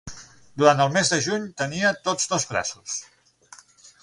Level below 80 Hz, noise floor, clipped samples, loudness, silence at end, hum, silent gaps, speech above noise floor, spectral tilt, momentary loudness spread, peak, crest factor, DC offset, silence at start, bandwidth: -58 dBFS; -51 dBFS; under 0.1%; -22 LUFS; 1 s; none; none; 28 dB; -3 dB/octave; 13 LU; -2 dBFS; 22 dB; under 0.1%; 0.05 s; 11.5 kHz